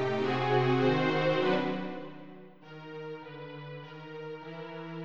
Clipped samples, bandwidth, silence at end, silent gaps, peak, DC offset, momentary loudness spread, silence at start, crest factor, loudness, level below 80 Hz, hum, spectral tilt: under 0.1%; 7.6 kHz; 0 s; none; -14 dBFS; under 0.1%; 20 LU; 0 s; 18 dB; -29 LUFS; -78 dBFS; none; -7.5 dB/octave